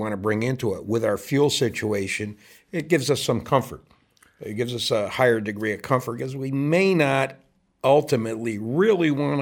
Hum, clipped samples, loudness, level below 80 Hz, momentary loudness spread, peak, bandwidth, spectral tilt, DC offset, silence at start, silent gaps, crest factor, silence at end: none; under 0.1%; -23 LUFS; -60 dBFS; 10 LU; -4 dBFS; 18 kHz; -5.5 dB/octave; under 0.1%; 0 s; none; 20 dB; 0 s